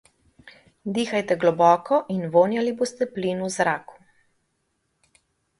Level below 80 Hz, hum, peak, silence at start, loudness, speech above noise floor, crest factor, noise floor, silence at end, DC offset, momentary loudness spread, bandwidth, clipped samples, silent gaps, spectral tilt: -68 dBFS; none; -4 dBFS; 0.45 s; -22 LUFS; 51 dB; 20 dB; -73 dBFS; 1.65 s; under 0.1%; 9 LU; 11.5 kHz; under 0.1%; none; -5.5 dB/octave